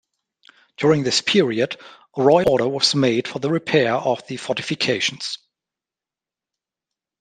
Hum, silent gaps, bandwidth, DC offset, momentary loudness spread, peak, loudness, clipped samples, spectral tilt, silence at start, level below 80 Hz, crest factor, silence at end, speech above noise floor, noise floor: none; none; 13 kHz; under 0.1%; 10 LU; -2 dBFS; -19 LUFS; under 0.1%; -4.5 dB/octave; 0.8 s; -58 dBFS; 20 dB; 1.85 s; 70 dB; -89 dBFS